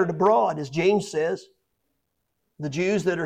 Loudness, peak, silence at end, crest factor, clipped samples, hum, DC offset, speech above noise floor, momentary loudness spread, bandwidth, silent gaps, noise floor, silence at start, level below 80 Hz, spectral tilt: -23 LUFS; -8 dBFS; 0 s; 16 dB; under 0.1%; none; under 0.1%; 54 dB; 12 LU; 10.5 kHz; none; -77 dBFS; 0 s; -64 dBFS; -6 dB/octave